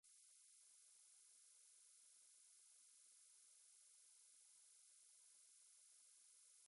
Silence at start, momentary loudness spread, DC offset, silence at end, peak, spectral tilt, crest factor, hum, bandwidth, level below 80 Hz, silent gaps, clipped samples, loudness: 0.05 s; 0 LU; under 0.1%; 0 s; -56 dBFS; 4 dB/octave; 14 dB; none; 11.5 kHz; under -90 dBFS; none; under 0.1%; -68 LUFS